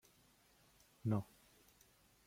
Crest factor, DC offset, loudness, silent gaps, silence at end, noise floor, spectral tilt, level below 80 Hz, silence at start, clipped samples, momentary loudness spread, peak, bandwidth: 22 dB; under 0.1%; -42 LUFS; none; 1.05 s; -71 dBFS; -8 dB/octave; -76 dBFS; 1.05 s; under 0.1%; 26 LU; -26 dBFS; 16.5 kHz